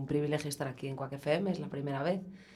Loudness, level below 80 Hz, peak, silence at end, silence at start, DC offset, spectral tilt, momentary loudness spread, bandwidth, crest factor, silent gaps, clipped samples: -35 LUFS; -68 dBFS; -16 dBFS; 0 s; 0 s; under 0.1%; -6 dB/octave; 6 LU; 14.5 kHz; 18 dB; none; under 0.1%